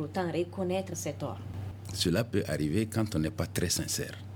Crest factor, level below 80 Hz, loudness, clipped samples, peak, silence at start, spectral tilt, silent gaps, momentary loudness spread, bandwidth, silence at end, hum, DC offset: 18 dB; -54 dBFS; -32 LUFS; under 0.1%; -14 dBFS; 0 s; -4.5 dB/octave; none; 9 LU; 20 kHz; 0 s; none; under 0.1%